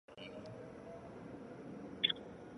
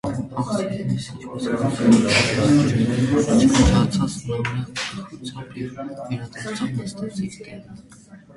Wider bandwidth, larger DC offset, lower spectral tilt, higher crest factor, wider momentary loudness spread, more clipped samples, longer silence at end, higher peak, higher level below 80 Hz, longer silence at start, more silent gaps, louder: about the same, 11 kHz vs 11.5 kHz; neither; about the same, -5 dB/octave vs -5.5 dB/octave; first, 30 dB vs 18 dB; about the same, 16 LU vs 17 LU; neither; about the same, 0 s vs 0.05 s; second, -16 dBFS vs -4 dBFS; second, -70 dBFS vs -36 dBFS; about the same, 0.1 s vs 0.05 s; neither; second, -43 LUFS vs -21 LUFS